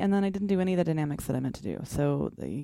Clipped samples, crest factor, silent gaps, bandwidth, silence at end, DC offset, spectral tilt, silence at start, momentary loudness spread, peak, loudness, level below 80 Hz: under 0.1%; 16 dB; none; 16 kHz; 0 s; under 0.1%; -7.5 dB/octave; 0 s; 7 LU; -12 dBFS; -29 LUFS; -52 dBFS